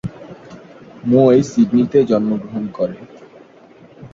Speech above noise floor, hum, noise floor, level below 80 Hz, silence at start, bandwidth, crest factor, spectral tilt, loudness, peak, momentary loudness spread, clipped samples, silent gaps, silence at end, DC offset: 30 dB; none; -44 dBFS; -54 dBFS; 0.05 s; 7.6 kHz; 16 dB; -8 dB/octave; -16 LUFS; -2 dBFS; 25 LU; under 0.1%; none; 0.05 s; under 0.1%